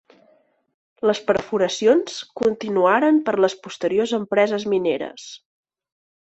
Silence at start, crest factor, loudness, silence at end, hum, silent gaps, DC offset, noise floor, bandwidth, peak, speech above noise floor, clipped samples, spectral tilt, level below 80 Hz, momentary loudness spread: 1.05 s; 18 dB; -20 LUFS; 0.95 s; none; none; under 0.1%; -60 dBFS; 8.2 kHz; -4 dBFS; 40 dB; under 0.1%; -4.5 dB/octave; -62 dBFS; 10 LU